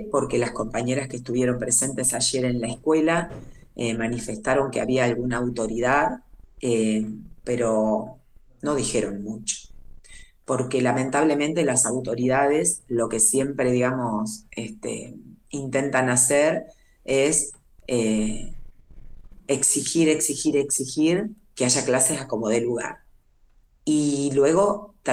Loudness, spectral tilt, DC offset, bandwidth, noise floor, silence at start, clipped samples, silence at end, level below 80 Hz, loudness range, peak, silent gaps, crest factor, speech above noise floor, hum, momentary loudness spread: -23 LUFS; -4 dB/octave; under 0.1%; 16.5 kHz; -57 dBFS; 0 s; under 0.1%; 0 s; -48 dBFS; 4 LU; -6 dBFS; none; 18 dB; 35 dB; none; 13 LU